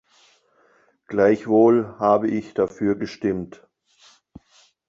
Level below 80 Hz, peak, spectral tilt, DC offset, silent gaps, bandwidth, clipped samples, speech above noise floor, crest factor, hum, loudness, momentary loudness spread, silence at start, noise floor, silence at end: -58 dBFS; -4 dBFS; -8 dB/octave; under 0.1%; none; 7.4 kHz; under 0.1%; 40 dB; 18 dB; none; -21 LUFS; 11 LU; 1.1 s; -60 dBFS; 1.4 s